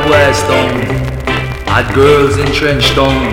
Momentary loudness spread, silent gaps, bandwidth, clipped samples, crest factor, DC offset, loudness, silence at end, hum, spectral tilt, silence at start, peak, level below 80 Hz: 8 LU; none; 17 kHz; 0.4%; 10 dB; under 0.1%; -11 LUFS; 0 s; none; -5 dB/octave; 0 s; 0 dBFS; -24 dBFS